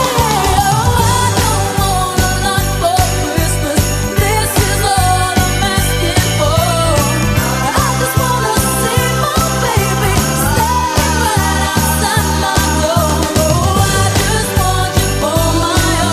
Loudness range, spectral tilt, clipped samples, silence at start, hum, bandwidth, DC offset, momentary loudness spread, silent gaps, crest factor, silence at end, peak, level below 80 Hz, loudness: 1 LU; -4 dB/octave; under 0.1%; 0 s; none; 15.5 kHz; under 0.1%; 2 LU; none; 12 dB; 0 s; 0 dBFS; -22 dBFS; -13 LUFS